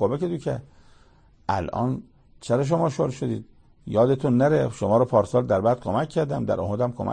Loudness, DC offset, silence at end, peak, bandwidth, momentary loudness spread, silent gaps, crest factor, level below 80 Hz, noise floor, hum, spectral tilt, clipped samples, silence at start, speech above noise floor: -24 LUFS; under 0.1%; 0 s; -6 dBFS; 9.8 kHz; 11 LU; none; 18 dB; -52 dBFS; -55 dBFS; none; -8 dB/octave; under 0.1%; 0 s; 32 dB